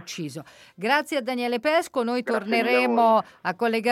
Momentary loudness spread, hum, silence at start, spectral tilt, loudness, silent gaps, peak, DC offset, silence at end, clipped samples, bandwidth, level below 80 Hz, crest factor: 13 LU; none; 0 s; -4.5 dB/octave; -23 LUFS; none; -8 dBFS; under 0.1%; 0 s; under 0.1%; 16 kHz; -74 dBFS; 16 dB